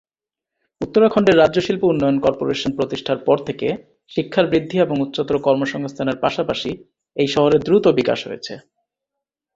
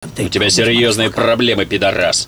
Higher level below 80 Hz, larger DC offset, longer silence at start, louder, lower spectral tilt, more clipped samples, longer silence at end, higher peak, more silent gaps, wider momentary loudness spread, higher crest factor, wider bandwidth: second, -52 dBFS vs -42 dBFS; neither; first, 0.8 s vs 0 s; second, -18 LUFS vs -13 LUFS; first, -6.5 dB/octave vs -3 dB/octave; neither; first, 0.95 s vs 0 s; about the same, -2 dBFS vs -4 dBFS; neither; first, 14 LU vs 4 LU; first, 18 dB vs 12 dB; second, 7.8 kHz vs over 20 kHz